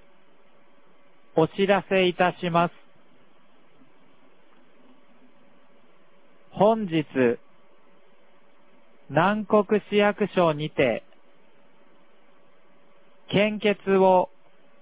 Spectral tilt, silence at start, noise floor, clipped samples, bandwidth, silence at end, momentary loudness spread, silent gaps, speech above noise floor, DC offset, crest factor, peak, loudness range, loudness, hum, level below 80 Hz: -10 dB/octave; 1.35 s; -60 dBFS; under 0.1%; 4 kHz; 0.55 s; 7 LU; none; 38 dB; 0.4%; 20 dB; -6 dBFS; 5 LU; -23 LUFS; none; -64 dBFS